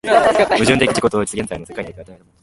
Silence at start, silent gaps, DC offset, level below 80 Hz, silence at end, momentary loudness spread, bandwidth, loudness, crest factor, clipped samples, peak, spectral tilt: 0.05 s; none; under 0.1%; -44 dBFS; 0.3 s; 16 LU; 11.5 kHz; -16 LUFS; 16 dB; under 0.1%; 0 dBFS; -4 dB/octave